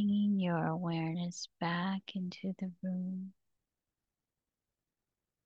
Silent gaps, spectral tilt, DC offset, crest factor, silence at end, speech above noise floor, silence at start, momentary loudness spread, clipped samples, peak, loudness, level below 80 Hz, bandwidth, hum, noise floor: none; -6.5 dB/octave; under 0.1%; 16 dB; 2.15 s; over 53 dB; 0 s; 10 LU; under 0.1%; -20 dBFS; -36 LUFS; -80 dBFS; 7.8 kHz; none; under -90 dBFS